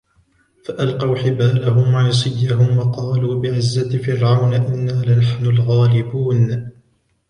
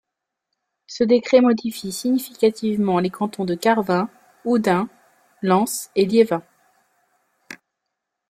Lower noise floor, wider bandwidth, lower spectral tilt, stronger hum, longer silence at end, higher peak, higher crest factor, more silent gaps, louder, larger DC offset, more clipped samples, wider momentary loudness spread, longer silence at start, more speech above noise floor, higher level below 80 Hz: second, -59 dBFS vs -81 dBFS; second, 10 kHz vs 15.5 kHz; first, -7.5 dB/octave vs -5.5 dB/octave; neither; second, 0.6 s vs 0.75 s; about the same, -4 dBFS vs -2 dBFS; about the same, 14 dB vs 18 dB; neither; first, -17 LUFS vs -20 LUFS; neither; neither; second, 5 LU vs 15 LU; second, 0.7 s vs 0.9 s; second, 44 dB vs 62 dB; first, -48 dBFS vs -64 dBFS